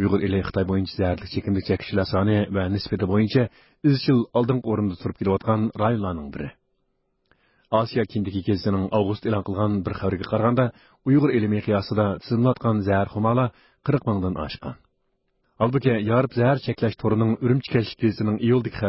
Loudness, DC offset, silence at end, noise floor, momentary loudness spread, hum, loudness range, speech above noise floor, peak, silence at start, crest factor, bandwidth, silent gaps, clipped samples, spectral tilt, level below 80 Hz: -23 LUFS; under 0.1%; 0 s; -71 dBFS; 6 LU; none; 4 LU; 49 dB; -6 dBFS; 0 s; 16 dB; 5.8 kHz; none; under 0.1%; -12 dB/octave; -44 dBFS